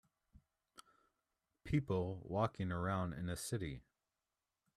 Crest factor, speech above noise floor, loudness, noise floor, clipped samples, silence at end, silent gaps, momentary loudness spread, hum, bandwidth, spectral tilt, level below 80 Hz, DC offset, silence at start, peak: 22 dB; over 50 dB; -41 LUFS; under -90 dBFS; under 0.1%; 0.95 s; none; 8 LU; none; 14 kHz; -6.5 dB/octave; -62 dBFS; under 0.1%; 1.65 s; -22 dBFS